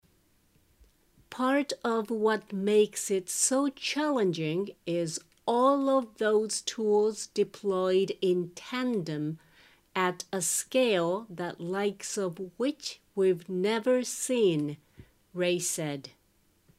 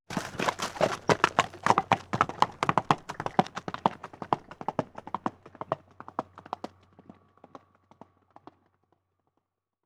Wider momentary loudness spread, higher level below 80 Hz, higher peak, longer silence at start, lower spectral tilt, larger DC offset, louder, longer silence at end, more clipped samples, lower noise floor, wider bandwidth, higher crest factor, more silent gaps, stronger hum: second, 10 LU vs 14 LU; second, -72 dBFS vs -64 dBFS; second, -12 dBFS vs -4 dBFS; first, 1.3 s vs 0.1 s; about the same, -4 dB/octave vs -4.5 dB/octave; neither; about the same, -29 LUFS vs -30 LUFS; second, 0.7 s vs 3.2 s; neither; second, -68 dBFS vs -81 dBFS; about the same, 16 kHz vs 17 kHz; second, 16 dB vs 28 dB; neither; neither